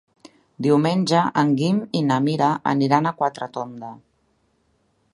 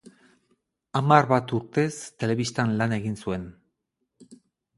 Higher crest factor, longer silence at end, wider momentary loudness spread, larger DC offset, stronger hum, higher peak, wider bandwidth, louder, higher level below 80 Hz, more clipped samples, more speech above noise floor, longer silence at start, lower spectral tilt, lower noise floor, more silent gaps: about the same, 20 dB vs 24 dB; first, 1.2 s vs 0.4 s; about the same, 12 LU vs 12 LU; neither; neither; about the same, -2 dBFS vs -2 dBFS; about the same, 11.5 kHz vs 11.5 kHz; first, -20 LUFS vs -25 LUFS; second, -66 dBFS vs -58 dBFS; neither; second, 46 dB vs 55 dB; second, 0.6 s vs 0.95 s; about the same, -6.5 dB/octave vs -6 dB/octave; second, -66 dBFS vs -79 dBFS; neither